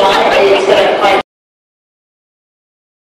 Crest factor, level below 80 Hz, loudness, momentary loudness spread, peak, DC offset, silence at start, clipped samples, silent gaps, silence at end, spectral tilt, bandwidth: 12 dB; -48 dBFS; -9 LUFS; 6 LU; 0 dBFS; under 0.1%; 0 s; under 0.1%; none; 1.85 s; -3.5 dB/octave; 15 kHz